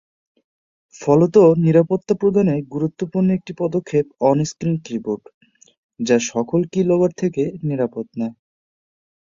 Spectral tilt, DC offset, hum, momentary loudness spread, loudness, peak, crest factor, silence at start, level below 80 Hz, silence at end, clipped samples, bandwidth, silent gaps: -7 dB/octave; under 0.1%; none; 13 LU; -19 LUFS; -2 dBFS; 18 dB; 1 s; -58 dBFS; 1.05 s; under 0.1%; 7.6 kHz; 5.34-5.41 s, 5.78-5.89 s